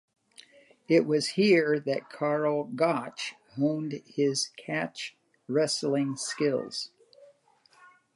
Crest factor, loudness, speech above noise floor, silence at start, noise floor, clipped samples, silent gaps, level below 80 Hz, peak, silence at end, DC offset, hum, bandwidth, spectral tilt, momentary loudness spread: 18 dB; -28 LUFS; 35 dB; 0.9 s; -63 dBFS; under 0.1%; none; -82 dBFS; -10 dBFS; 0.9 s; under 0.1%; none; 11.5 kHz; -4.5 dB/octave; 12 LU